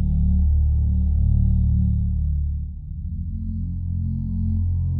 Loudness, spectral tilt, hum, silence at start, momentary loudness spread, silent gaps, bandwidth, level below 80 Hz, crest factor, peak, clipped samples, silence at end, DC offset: -23 LUFS; -14.5 dB/octave; none; 0 s; 10 LU; none; 0.9 kHz; -22 dBFS; 12 dB; -8 dBFS; under 0.1%; 0 s; under 0.1%